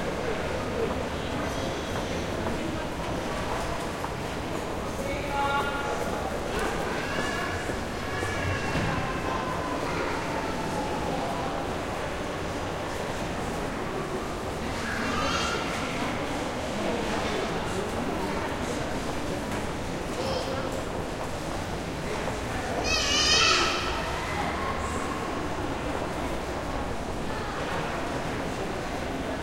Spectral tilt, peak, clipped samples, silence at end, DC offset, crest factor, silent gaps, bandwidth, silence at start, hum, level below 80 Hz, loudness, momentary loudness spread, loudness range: -4 dB/octave; -8 dBFS; under 0.1%; 0 s; under 0.1%; 20 dB; none; 16.5 kHz; 0 s; none; -42 dBFS; -29 LUFS; 5 LU; 6 LU